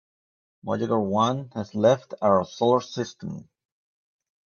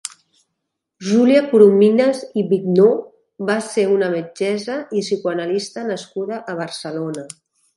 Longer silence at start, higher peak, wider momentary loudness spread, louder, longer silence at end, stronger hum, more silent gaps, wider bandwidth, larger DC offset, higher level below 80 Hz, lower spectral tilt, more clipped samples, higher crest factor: first, 0.65 s vs 0.05 s; second, -6 dBFS vs 0 dBFS; about the same, 15 LU vs 14 LU; second, -24 LUFS vs -18 LUFS; first, 1.05 s vs 0.5 s; neither; neither; second, 7.2 kHz vs 11.5 kHz; neither; about the same, -68 dBFS vs -70 dBFS; about the same, -6.5 dB/octave vs -6 dB/octave; neither; about the same, 20 dB vs 18 dB